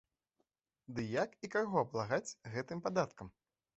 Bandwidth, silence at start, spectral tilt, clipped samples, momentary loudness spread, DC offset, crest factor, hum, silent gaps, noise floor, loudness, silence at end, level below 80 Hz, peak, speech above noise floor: 8 kHz; 0.9 s; -5 dB/octave; under 0.1%; 10 LU; under 0.1%; 20 dB; none; none; -84 dBFS; -38 LUFS; 0.45 s; -72 dBFS; -18 dBFS; 46 dB